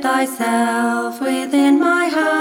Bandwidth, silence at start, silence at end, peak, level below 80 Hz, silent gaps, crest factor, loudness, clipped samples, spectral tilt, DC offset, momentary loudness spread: 17 kHz; 0 s; 0 s; -4 dBFS; -70 dBFS; none; 12 dB; -17 LUFS; under 0.1%; -3 dB/octave; under 0.1%; 7 LU